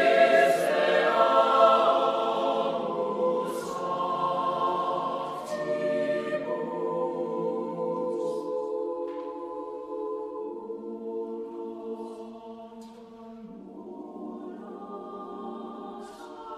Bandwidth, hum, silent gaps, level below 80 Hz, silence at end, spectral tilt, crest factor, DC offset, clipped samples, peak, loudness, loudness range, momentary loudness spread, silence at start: 14.5 kHz; none; none; -72 dBFS; 0 s; -4.5 dB/octave; 20 dB; under 0.1%; under 0.1%; -8 dBFS; -27 LUFS; 17 LU; 21 LU; 0 s